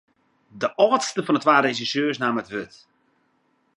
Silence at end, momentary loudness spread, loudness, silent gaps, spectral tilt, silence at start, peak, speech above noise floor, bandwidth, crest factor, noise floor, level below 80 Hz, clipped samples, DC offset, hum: 1.1 s; 13 LU; -22 LUFS; none; -4 dB/octave; 0.55 s; -2 dBFS; 45 dB; 11.5 kHz; 22 dB; -67 dBFS; -70 dBFS; under 0.1%; under 0.1%; none